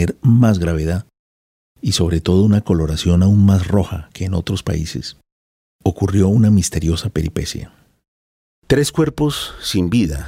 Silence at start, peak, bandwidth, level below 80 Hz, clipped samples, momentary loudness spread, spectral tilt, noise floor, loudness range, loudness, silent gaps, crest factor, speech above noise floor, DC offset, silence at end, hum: 0 s; -2 dBFS; 16 kHz; -36 dBFS; under 0.1%; 12 LU; -6.5 dB/octave; under -90 dBFS; 3 LU; -17 LUFS; 1.19-1.75 s, 5.32-5.79 s, 8.08-8.62 s; 16 dB; over 74 dB; under 0.1%; 0 s; none